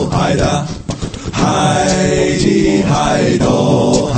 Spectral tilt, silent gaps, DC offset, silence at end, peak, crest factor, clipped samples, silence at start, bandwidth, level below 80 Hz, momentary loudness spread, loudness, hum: -5.5 dB/octave; none; under 0.1%; 0 s; 0 dBFS; 12 dB; under 0.1%; 0 s; 8.8 kHz; -30 dBFS; 10 LU; -13 LUFS; none